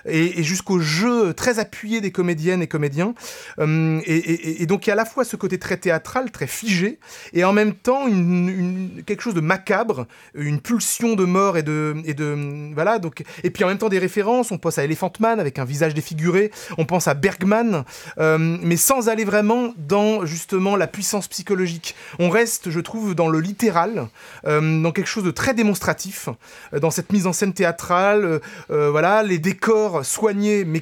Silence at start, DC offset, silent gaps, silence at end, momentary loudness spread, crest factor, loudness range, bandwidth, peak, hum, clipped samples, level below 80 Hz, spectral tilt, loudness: 0.05 s; under 0.1%; none; 0 s; 8 LU; 18 dB; 3 LU; 18.5 kHz; -2 dBFS; none; under 0.1%; -58 dBFS; -5 dB/octave; -20 LUFS